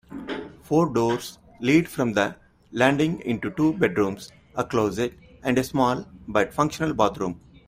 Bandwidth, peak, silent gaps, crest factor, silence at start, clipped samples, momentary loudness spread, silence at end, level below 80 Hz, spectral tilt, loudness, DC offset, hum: 16 kHz; -4 dBFS; none; 20 dB; 0.1 s; under 0.1%; 12 LU; 0.3 s; -54 dBFS; -6 dB/octave; -24 LUFS; under 0.1%; none